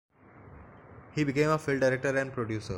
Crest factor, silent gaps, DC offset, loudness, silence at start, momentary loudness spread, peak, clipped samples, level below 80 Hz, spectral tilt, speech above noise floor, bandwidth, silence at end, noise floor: 18 dB; none; under 0.1%; -29 LUFS; 0.35 s; 7 LU; -14 dBFS; under 0.1%; -58 dBFS; -6.5 dB/octave; 24 dB; 16.5 kHz; 0 s; -52 dBFS